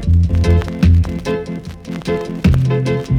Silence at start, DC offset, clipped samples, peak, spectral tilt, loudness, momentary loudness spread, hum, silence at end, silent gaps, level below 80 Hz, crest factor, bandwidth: 0 s; under 0.1%; under 0.1%; -2 dBFS; -8 dB/octave; -16 LUFS; 13 LU; none; 0 s; none; -22 dBFS; 12 dB; 9.8 kHz